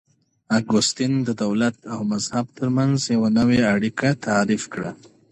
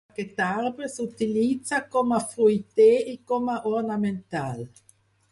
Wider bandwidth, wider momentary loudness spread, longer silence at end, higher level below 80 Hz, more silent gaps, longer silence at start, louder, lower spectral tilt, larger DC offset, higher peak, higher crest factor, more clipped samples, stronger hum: about the same, 11 kHz vs 11.5 kHz; second, 8 LU vs 13 LU; second, 0.35 s vs 0.65 s; first, -54 dBFS vs -66 dBFS; neither; first, 0.5 s vs 0.2 s; first, -21 LUFS vs -25 LUFS; about the same, -5 dB/octave vs -5.5 dB/octave; neither; about the same, -6 dBFS vs -8 dBFS; about the same, 14 dB vs 16 dB; neither; neither